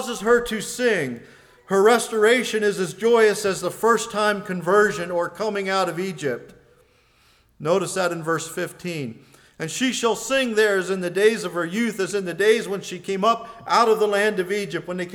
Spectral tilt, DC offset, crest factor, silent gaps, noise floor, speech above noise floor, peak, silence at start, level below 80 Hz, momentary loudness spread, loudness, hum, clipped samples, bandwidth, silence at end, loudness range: -4 dB/octave; under 0.1%; 16 dB; none; -58 dBFS; 37 dB; -6 dBFS; 0 s; -60 dBFS; 11 LU; -22 LUFS; none; under 0.1%; 18.5 kHz; 0 s; 6 LU